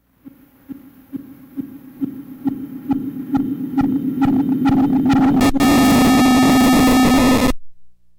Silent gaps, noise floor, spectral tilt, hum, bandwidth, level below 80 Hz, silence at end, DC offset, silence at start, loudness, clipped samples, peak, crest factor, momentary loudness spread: none; -45 dBFS; -5 dB/octave; none; 18.5 kHz; -34 dBFS; 0.3 s; under 0.1%; 0.25 s; -15 LUFS; under 0.1%; -8 dBFS; 8 dB; 19 LU